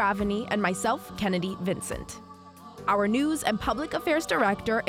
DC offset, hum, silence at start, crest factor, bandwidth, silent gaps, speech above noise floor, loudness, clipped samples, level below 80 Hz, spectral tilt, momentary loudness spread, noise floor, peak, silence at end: under 0.1%; none; 0 s; 18 dB; 16.5 kHz; none; 20 dB; -27 LUFS; under 0.1%; -50 dBFS; -4.5 dB/octave; 12 LU; -47 dBFS; -8 dBFS; 0 s